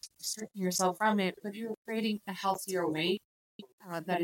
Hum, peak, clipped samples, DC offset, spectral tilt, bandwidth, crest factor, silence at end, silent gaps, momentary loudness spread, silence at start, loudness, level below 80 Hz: none; -16 dBFS; under 0.1%; under 0.1%; -4 dB/octave; 17 kHz; 18 dB; 0 s; 1.77-1.85 s, 3.25-3.59 s, 3.73-3.78 s; 11 LU; 0.05 s; -33 LUFS; -80 dBFS